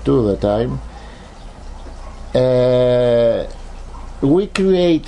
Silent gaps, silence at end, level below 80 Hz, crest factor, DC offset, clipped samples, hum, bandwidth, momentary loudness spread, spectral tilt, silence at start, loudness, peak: none; 0 s; -32 dBFS; 16 dB; under 0.1%; under 0.1%; none; 11 kHz; 23 LU; -7.5 dB/octave; 0 s; -16 LUFS; -2 dBFS